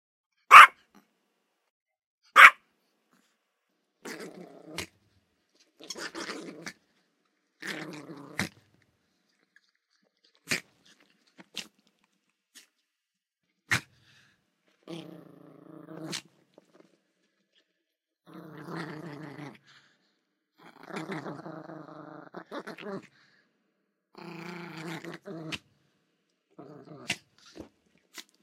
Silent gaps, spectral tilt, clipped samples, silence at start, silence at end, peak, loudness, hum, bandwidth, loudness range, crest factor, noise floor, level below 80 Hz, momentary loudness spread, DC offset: 1.70-1.86 s, 2.06-2.18 s; -2 dB/octave; under 0.1%; 0.5 s; 1.3 s; 0 dBFS; -18 LUFS; none; 16 kHz; 23 LU; 30 dB; -86 dBFS; -74 dBFS; 31 LU; under 0.1%